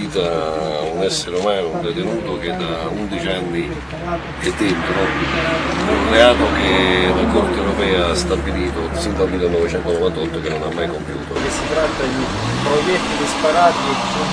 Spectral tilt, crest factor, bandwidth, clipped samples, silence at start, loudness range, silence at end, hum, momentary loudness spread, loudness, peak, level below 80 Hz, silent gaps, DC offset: -4.5 dB/octave; 18 dB; 11 kHz; under 0.1%; 0 s; 6 LU; 0 s; none; 9 LU; -18 LUFS; 0 dBFS; -32 dBFS; none; under 0.1%